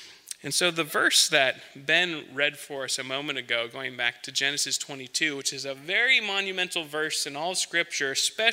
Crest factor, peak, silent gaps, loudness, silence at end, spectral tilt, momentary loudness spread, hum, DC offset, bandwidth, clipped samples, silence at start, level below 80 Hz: 22 dB; -4 dBFS; none; -25 LUFS; 0 s; -1 dB/octave; 9 LU; none; under 0.1%; 16 kHz; under 0.1%; 0 s; -82 dBFS